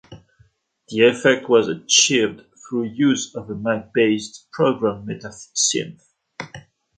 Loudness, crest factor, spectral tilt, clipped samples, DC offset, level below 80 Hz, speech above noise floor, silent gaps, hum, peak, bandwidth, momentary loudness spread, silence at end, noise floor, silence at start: -19 LUFS; 20 dB; -3 dB/octave; under 0.1%; under 0.1%; -60 dBFS; 39 dB; none; none; -2 dBFS; 9.6 kHz; 18 LU; 0.4 s; -58 dBFS; 0.1 s